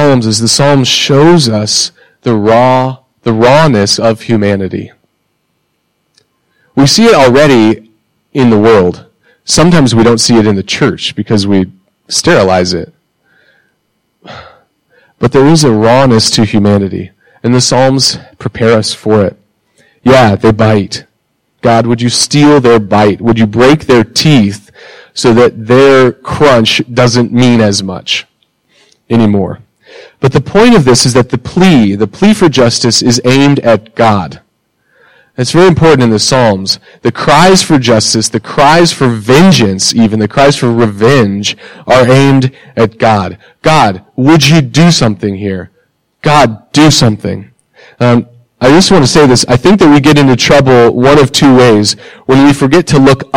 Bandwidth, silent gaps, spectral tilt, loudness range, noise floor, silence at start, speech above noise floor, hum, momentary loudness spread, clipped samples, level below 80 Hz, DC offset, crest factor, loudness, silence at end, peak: 16.5 kHz; none; -5 dB/octave; 5 LU; -61 dBFS; 0 s; 54 dB; none; 10 LU; 0.1%; -36 dBFS; under 0.1%; 8 dB; -7 LUFS; 0 s; 0 dBFS